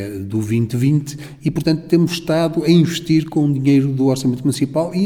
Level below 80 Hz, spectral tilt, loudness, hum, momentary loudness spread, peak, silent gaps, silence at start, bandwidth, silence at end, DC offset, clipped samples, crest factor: -50 dBFS; -7 dB/octave; -17 LUFS; none; 7 LU; -2 dBFS; none; 0 s; 17 kHz; 0 s; under 0.1%; under 0.1%; 16 dB